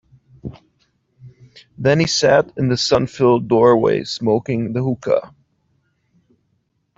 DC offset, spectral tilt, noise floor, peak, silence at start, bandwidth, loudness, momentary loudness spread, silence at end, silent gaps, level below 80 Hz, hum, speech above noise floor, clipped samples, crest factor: under 0.1%; -5.5 dB/octave; -67 dBFS; -2 dBFS; 0.45 s; 8 kHz; -17 LUFS; 8 LU; 1.7 s; none; -50 dBFS; none; 51 dB; under 0.1%; 16 dB